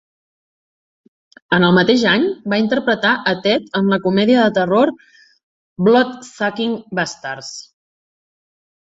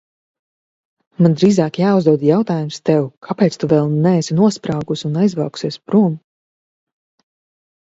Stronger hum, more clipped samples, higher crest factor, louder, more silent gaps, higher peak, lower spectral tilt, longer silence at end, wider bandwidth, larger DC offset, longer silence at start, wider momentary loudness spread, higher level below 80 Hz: neither; neither; about the same, 16 dB vs 16 dB; about the same, -16 LUFS vs -16 LUFS; first, 5.43-5.76 s vs 3.17-3.22 s; about the same, -2 dBFS vs 0 dBFS; second, -5.5 dB/octave vs -7.5 dB/octave; second, 1.2 s vs 1.65 s; about the same, 8 kHz vs 8 kHz; neither; first, 1.5 s vs 1.2 s; about the same, 10 LU vs 8 LU; about the same, -58 dBFS vs -58 dBFS